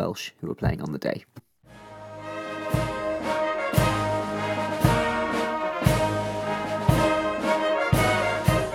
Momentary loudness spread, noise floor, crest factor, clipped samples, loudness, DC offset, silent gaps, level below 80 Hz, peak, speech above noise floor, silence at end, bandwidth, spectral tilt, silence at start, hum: 11 LU; -49 dBFS; 20 dB; under 0.1%; -25 LUFS; under 0.1%; none; -40 dBFS; -6 dBFS; 20 dB; 0 s; 18.5 kHz; -5.5 dB/octave; 0 s; none